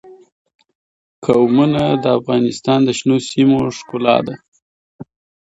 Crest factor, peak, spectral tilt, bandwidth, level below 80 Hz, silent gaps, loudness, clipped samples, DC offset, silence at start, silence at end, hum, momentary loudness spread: 16 dB; 0 dBFS; -6 dB/octave; 8 kHz; -52 dBFS; 0.32-0.45 s, 0.55-0.59 s, 0.75-1.22 s, 4.48-4.52 s, 4.62-4.99 s; -15 LUFS; under 0.1%; under 0.1%; 0.05 s; 0.4 s; none; 8 LU